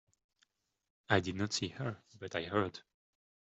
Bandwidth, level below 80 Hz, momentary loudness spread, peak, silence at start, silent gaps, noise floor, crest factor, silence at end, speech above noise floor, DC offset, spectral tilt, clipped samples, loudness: 8.2 kHz; -72 dBFS; 10 LU; -14 dBFS; 1.1 s; none; -77 dBFS; 26 dB; 0.65 s; 41 dB; under 0.1%; -4.5 dB/octave; under 0.1%; -36 LUFS